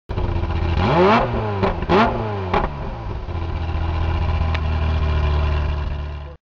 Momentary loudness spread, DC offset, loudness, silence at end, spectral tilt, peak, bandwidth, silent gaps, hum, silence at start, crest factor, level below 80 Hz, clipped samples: 12 LU; 0.5%; -21 LUFS; 0.1 s; -8 dB/octave; -6 dBFS; 6.6 kHz; none; none; 0.1 s; 14 dB; -24 dBFS; under 0.1%